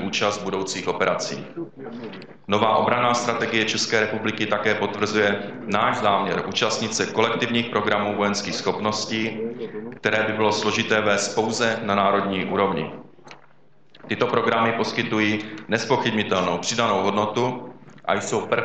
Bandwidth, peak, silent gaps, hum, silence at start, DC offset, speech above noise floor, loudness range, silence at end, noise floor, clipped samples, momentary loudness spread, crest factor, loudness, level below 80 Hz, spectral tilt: 9 kHz; -2 dBFS; none; none; 0 s; 0.3%; 35 dB; 2 LU; 0 s; -58 dBFS; under 0.1%; 10 LU; 20 dB; -22 LUFS; -60 dBFS; -4 dB/octave